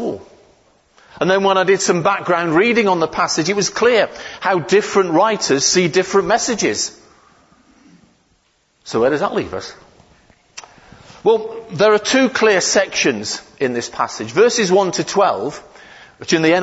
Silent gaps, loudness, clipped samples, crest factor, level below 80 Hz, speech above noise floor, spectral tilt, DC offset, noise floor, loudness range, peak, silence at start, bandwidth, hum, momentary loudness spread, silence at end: none; -16 LUFS; under 0.1%; 16 dB; -54 dBFS; 45 dB; -3.5 dB/octave; under 0.1%; -61 dBFS; 8 LU; -2 dBFS; 0 s; 8 kHz; none; 11 LU; 0 s